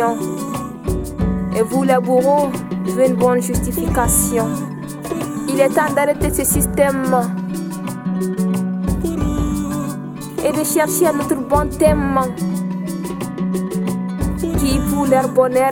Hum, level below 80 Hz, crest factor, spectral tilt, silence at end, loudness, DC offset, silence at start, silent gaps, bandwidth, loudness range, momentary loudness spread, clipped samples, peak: none; -30 dBFS; 16 dB; -5.5 dB/octave; 0 s; -18 LUFS; under 0.1%; 0 s; none; 17.5 kHz; 4 LU; 10 LU; under 0.1%; 0 dBFS